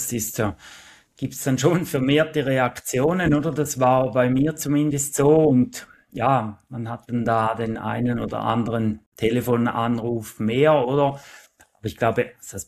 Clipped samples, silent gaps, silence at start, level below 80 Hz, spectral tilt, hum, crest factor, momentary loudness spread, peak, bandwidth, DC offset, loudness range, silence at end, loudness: under 0.1%; 9.06-9.12 s; 0 s; -50 dBFS; -5.5 dB/octave; none; 18 dB; 12 LU; -4 dBFS; 14.5 kHz; under 0.1%; 4 LU; 0.05 s; -22 LUFS